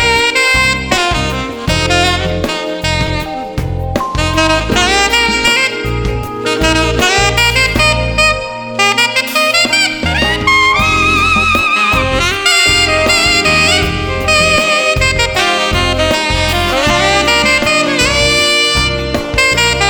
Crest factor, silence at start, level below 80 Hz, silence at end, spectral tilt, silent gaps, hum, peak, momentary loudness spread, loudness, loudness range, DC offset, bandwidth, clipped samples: 12 dB; 0 s; -24 dBFS; 0 s; -3 dB/octave; none; none; 0 dBFS; 8 LU; -10 LUFS; 4 LU; under 0.1%; over 20 kHz; under 0.1%